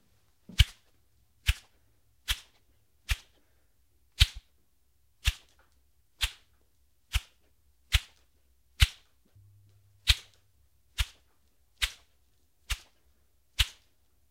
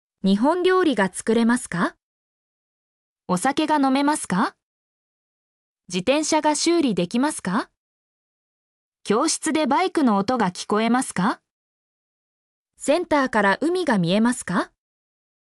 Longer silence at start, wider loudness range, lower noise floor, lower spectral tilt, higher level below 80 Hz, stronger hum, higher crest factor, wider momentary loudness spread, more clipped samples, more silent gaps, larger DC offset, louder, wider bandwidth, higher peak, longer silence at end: first, 0.6 s vs 0.25 s; first, 6 LU vs 2 LU; second, -72 dBFS vs under -90 dBFS; second, -1.5 dB/octave vs -4.5 dB/octave; first, -38 dBFS vs -62 dBFS; neither; first, 32 dB vs 16 dB; first, 15 LU vs 7 LU; neither; second, none vs 2.03-3.16 s, 4.63-5.76 s, 7.77-8.92 s, 11.51-12.65 s; neither; second, -32 LUFS vs -21 LUFS; first, 16 kHz vs 13.5 kHz; first, -4 dBFS vs -8 dBFS; second, 0.6 s vs 0.8 s